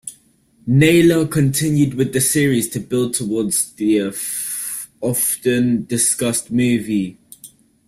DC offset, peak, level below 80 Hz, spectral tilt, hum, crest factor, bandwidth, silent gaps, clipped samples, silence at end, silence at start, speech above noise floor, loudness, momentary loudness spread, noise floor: under 0.1%; -2 dBFS; -52 dBFS; -4.5 dB/octave; none; 16 dB; 16 kHz; none; under 0.1%; 0.4 s; 0.05 s; 38 dB; -17 LUFS; 9 LU; -55 dBFS